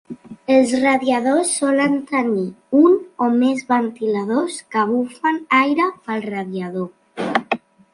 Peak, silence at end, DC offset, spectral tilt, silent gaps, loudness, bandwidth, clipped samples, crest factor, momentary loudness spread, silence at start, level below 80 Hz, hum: -2 dBFS; 0.35 s; under 0.1%; -4.5 dB/octave; none; -19 LUFS; 11.5 kHz; under 0.1%; 16 dB; 11 LU; 0.1 s; -66 dBFS; none